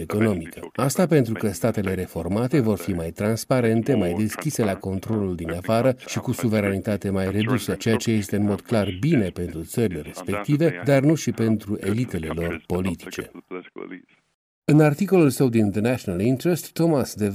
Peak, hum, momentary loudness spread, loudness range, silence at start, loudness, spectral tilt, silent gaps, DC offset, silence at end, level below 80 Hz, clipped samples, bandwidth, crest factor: -6 dBFS; none; 10 LU; 3 LU; 0 s; -23 LUFS; -6.5 dB/octave; 14.35-14.62 s; under 0.1%; 0 s; -50 dBFS; under 0.1%; 16 kHz; 16 dB